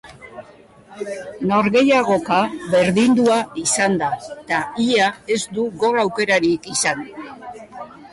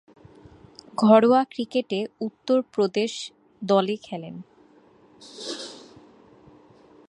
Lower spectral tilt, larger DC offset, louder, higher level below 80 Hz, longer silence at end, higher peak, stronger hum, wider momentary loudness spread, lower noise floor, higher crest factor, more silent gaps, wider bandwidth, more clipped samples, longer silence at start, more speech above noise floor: second, -4 dB/octave vs -5.5 dB/octave; neither; first, -18 LUFS vs -23 LUFS; first, -56 dBFS vs -70 dBFS; second, 0.05 s vs 1.35 s; second, -6 dBFS vs -2 dBFS; neither; about the same, 20 LU vs 22 LU; second, -46 dBFS vs -55 dBFS; second, 14 dB vs 24 dB; neither; about the same, 11.5 kHz vs 11 kHz; neither; second, 0.05 s vs 1 s; second, 28 dB vs 33 dB